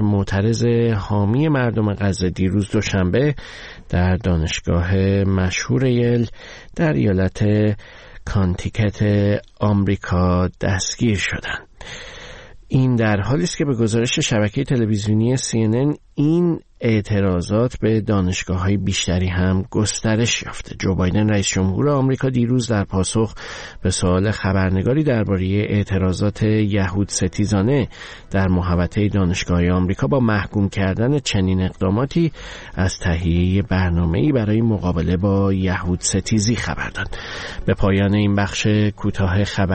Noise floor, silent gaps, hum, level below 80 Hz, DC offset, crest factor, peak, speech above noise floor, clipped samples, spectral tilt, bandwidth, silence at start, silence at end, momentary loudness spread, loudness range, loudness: -38 dBFS; none; none; -36 dBFS; 0.1%; 12 dB; -6 dBFS; 20 dB; under 0.1%; -6 dB/octave; 8.8 kHz; 0 s; 0 s; 6 LU; 1 LU; -19 LUFS